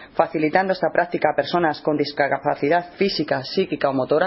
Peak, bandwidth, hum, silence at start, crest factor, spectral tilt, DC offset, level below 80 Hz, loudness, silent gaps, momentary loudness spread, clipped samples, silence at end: -2 dBFS; 6 kHz; none; 0 s; 18 dB; -8.5 dB/octave; under 0.1%; -58 dBFS; -21 LUFS; none; 3 LU; under 0.1%; 0 s